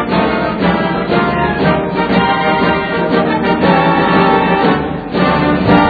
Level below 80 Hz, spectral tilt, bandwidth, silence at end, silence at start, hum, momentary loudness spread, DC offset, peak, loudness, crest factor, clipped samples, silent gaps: -34 dBFS; -9 dB/octave; 4.9 kHz; 0 s; 0 s; none; 4 LU; under 0.1%; 0 dBFS; -13 LUFS; 12 dB; under 0.1%; none